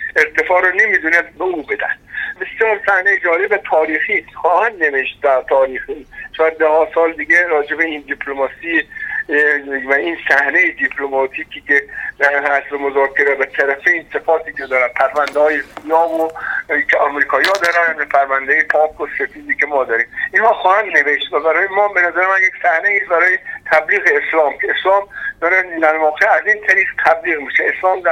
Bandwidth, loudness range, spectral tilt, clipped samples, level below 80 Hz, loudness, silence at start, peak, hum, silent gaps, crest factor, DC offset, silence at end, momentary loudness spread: 16 kHz; 2 LU; -3 dB/octave; under 0.1%; -52 dBFS; -14 LUFS; 0 s; 0 dBFS; none; none; 16 dB; under 0.1%; 0 s; 8 LU